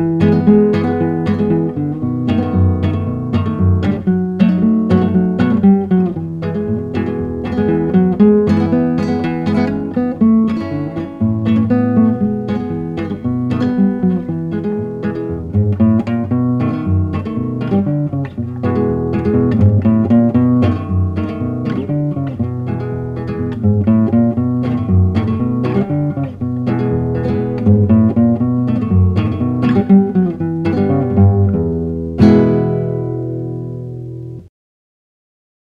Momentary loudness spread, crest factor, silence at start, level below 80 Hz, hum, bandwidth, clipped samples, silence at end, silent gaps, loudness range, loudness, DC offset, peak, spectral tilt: 10 LU; 14 dB; 0 s; -38 dBFS; none; 5.4 kHz; under 0.1%; 1.25 s; none; 3 LU; -15 LUFS; under 0.1%; 0 dBFS; -10.5 dB/octave